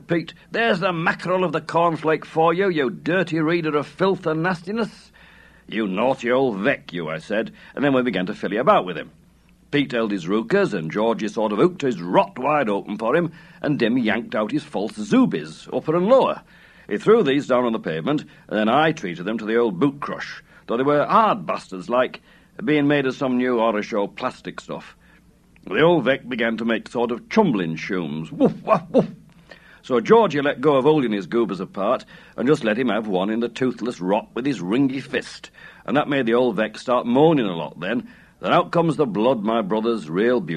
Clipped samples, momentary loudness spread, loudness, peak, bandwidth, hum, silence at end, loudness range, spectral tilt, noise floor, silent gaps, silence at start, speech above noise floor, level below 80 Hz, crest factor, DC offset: under 0.1%; 11 LU; -21 LUFS; -2 dBFS; 11 kHz; none; 0 s; 3 LU; -6.5 dB/octave; -54 dBFS; none; 0.1 s; 33 dB; -60 dBFS; 20 dB; under 0.1%